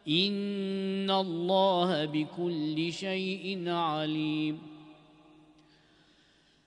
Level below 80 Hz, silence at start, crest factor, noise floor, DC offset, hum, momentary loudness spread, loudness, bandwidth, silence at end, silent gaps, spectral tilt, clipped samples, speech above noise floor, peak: -76 dBFS; 0.05 s; 20 dB; -65 dBFS; under 0.1%; none; 7 LU; -30 LUFS; 10.5 kHz; 1.75 s; none; -6 dB/octave; under 0.1%; 35 dB; -12 dBFS